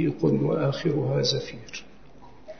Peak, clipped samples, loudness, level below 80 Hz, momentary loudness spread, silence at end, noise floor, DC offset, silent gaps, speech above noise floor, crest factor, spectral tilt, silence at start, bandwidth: -12 dBFS; under 0.1%; -25 LUFS; -56 dBFS; 15 LU; 0.05 s; -51 dBFS; 0.5%; none; 25 dB; 14 dB; -6 dB/octave; 0 s; 6.6 kHz